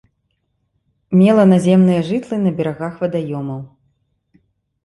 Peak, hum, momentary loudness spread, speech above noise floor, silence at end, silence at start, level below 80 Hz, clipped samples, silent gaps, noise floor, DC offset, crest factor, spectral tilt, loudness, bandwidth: -2 dBFS; none; 14 LU; 54 dB; 1.2 s; 1.1 s; -56 dBFS; under 0.1%; none; -68 dBFS; under 0.1%; 16 dB; -8.5 dB/octave; -15 LUFS; 11.5 kHz